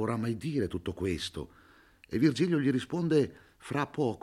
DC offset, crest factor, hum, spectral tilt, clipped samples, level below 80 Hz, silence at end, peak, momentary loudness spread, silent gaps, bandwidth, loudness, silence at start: under 0.1%; 18 dB; none; -6.5 dB/octave; under 0.1%; -60 dBFS; 0.05 s; -14 dBFS; 11 LU; none; 13.5 kHz; -31 LUFS; 0 s